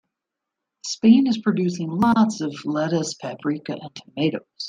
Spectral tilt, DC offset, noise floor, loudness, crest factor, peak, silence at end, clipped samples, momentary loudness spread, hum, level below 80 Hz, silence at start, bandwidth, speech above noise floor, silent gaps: -5.5 dB/octave; under 0.1%; -84 dBFS; -21 LUFS; 18 dB; -4 dBFS; 0 s; under 0.1%; 15 LU; none; -64 dBFS; 0.85 s; 9.6 kHz; 63 dB; none